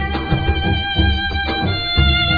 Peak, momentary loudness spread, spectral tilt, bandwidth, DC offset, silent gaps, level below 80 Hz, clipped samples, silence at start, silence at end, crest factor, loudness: -2 dBFS; 5 LU; -7.5 dB/octave; 5 kHz; under 0.1%; none; -22 dBFS; under 0.1%; 0 s; 0 s; 14 dB; -17 LUFS